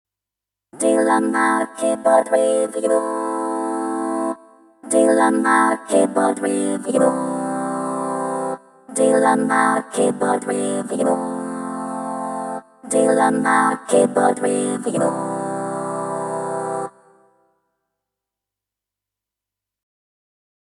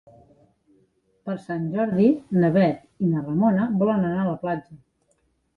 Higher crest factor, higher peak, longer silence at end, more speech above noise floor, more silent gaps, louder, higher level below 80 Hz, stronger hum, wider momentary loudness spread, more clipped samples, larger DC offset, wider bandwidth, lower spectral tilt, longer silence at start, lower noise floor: about the same, 18 dB vs 18 dB; first, -2 dBFS vs -6 dBFS; first, 3.75 s vs 0.8 s; first, 68 dB vs 46 dB; neither; first, -19 LUFS vs -23 LUFS; second, -78 dBFS vs -60 dBFS; first, 50 Hz at -60 dBFS vs none; about the same, 11 LU vs 11 LU; neither; neither; first, 13 kHz vs 4.8 kHz; second, -4.5 dB/octave vs -10 dB/octave; second, 0.75 s vs 1.25 s; first, -86 dBFS vs -68 dBFS